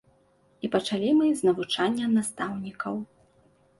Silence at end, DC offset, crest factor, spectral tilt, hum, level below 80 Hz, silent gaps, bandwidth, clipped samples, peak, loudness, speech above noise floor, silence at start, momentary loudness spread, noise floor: 0.75 s; under 0.1%; 16 dB; -4.5 dB/octave; none; -68 dBFS; none; 11.5 kHz; under 0.1%; -12 dBFS; -26 LUFS; 38 dB; 0.65 s; 12 LU; -63 dBFS